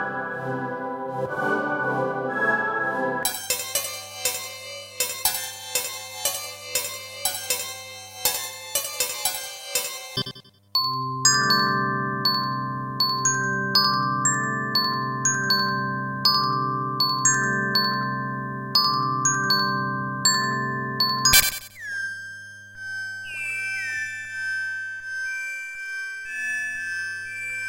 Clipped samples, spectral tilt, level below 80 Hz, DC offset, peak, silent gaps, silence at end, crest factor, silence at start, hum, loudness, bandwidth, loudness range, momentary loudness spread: under 0.1%; -1.5 dB/octave; -56 dBFS; under 0.1%; -2 dBFS; none; 0 s; 24 dB; 0 s; none; -23 LUFS; 16.5 kHz; 7 LU; 11 LU